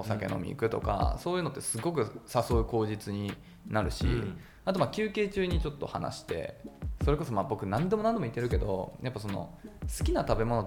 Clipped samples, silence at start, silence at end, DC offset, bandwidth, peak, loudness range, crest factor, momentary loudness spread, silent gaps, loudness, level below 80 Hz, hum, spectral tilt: under 0.1%; 0 s; 0 s; under 0.1%; 18.5 kHz; -10 dBFS; 1 LU; 20 dB; 9 LU; none; -32 LUFS; -40 dBFS; none; -6 dB/octave